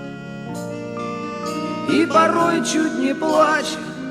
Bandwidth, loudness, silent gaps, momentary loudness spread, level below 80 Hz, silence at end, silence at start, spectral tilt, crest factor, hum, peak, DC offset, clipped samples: 14.5 kHz; -20 LUFS; none; 14 LU; -58 dBFS; 0 s; 0 s; -4.5 dB/octave; 16 dB; none; -4 dBFS; under 0.1%; under 0.1%